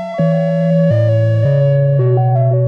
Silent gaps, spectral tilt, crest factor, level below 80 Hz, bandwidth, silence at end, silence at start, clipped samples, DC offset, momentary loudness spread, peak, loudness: none; -10.5 dB/octave; 8 dB; -52 dBFS; 5.4 kHz; 0 s; 0 s; under 0.1%; under 0.1%; 2 LU; -4 dBFS; -13 LUFS